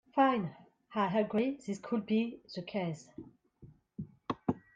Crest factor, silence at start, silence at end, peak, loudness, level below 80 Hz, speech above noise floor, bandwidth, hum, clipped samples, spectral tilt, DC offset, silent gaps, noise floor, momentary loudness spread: 18 dB; 0.15 s; 0.15 s; -16 dBFS; -34 LUFS; -72 dBFS; 26 dB; 9.2 kHz; none; under 0.1%; -7 dB/octave; under 0.1%; none; -59 dBFS; 18 LU